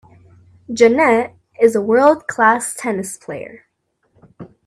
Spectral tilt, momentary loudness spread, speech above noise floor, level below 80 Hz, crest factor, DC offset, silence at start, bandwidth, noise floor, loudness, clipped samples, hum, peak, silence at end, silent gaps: -4.5 dB/octave; 16 LU; 52 dB; -62 dBFS; 18 dB; under 0.1%; 0.7 s; 13.5 kHz; -67 dBFS; -15 LUFS; under 0.1%; none; 0 dBFS; 0.2 s; none